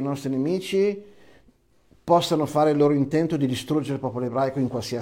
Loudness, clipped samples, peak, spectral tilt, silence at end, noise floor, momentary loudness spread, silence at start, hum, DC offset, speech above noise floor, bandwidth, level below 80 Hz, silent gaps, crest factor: -23 LUFS; under 0.1%; -6 dBFS; -6.5 dB/octave; 0 s; -60 dBFS; 7 LU; 0 s; none; under 0.1%; 37 dB; 16.5 kHz; -60 dBFS; none; 18 dB